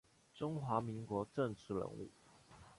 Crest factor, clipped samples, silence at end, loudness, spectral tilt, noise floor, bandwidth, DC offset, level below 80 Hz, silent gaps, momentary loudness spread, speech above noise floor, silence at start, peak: 20 dB; under 0.1%; 0.05 s; -42 LUFS; -7.5 dB/octave; -63 dBFS; 11.5 kHz; under 0.1%; -70 dBFS; none; 13 LU; 21 dB; 0.35 s; -22 dBFS